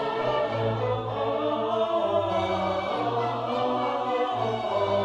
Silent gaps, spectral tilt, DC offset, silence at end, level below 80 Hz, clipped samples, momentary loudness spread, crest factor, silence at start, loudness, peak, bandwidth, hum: none; -6.5 dB/octave; under 0.1%; 0 s; -58 dBFS; under 0.1%; 3 LU; 14 dB; 0 s; -27 LUFS; -14 dBFS; 9.4 kHz; 60 Hz at -50 dBFS